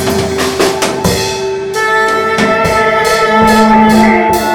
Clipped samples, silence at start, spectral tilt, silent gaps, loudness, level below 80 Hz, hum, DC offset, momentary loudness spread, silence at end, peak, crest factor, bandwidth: 0.2%; 0 s; -4 dB/octave; none; -10 LUFS; -34 dBFS; none; under 0.1%; 7 LU; 0 s; 0 dBFS; 10 dB; 19 kHz